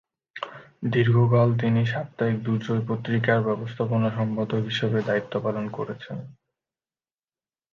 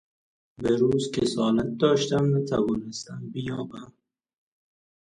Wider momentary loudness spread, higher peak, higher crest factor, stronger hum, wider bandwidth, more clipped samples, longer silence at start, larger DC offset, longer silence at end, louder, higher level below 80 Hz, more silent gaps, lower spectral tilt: first, 17 LU vs 13 LU; about the same, -8 dBFS vs -8 dBFS; about the same, 16 dB vs 18 dB; neither; second, 7 kHz vs 11 kHz; neither; second, 0.35 s vs 0.6 s; neither; first, 1.4 s vs 1.25 s; about the same, -24 LUFS vs -25 LUFS; second, -62 dBFS vs -56 dBFS; neither; first, -8.5 dB/octave vs -6 dB/octave